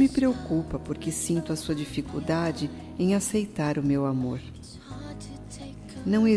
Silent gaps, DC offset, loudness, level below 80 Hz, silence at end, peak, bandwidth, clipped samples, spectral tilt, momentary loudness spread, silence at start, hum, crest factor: none; under 0.1%; -28 LUFS; -48 dBFS; 0 s; -12 dBFS; 11 kHz; under 0.1%; -6 dB/octave; 16 LU; 0 s; none; 16 dB